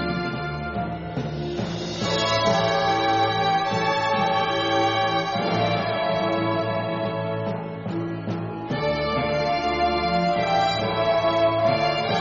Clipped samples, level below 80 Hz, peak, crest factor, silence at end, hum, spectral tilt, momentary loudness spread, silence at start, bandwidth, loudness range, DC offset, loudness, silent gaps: under 0.1%; -48 dBFS; -8 dBFS; 14 dB; 0 s; none; -3.5 dB/octave; 8 LU; 0 s; 7.4 kHz; 4 LU; under 0.1%; -23 LUFS; none